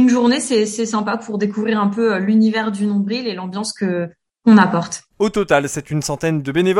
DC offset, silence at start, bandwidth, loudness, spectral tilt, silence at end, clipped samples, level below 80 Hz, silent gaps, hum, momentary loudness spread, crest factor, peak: under 0.1%; 0 s; 12 kHz; -18 LUFS; -5.5 dB/octave; 0 s; under 0.1%; -52 dBFS; none; none; 10 LU; 16 dB; 0 dBFS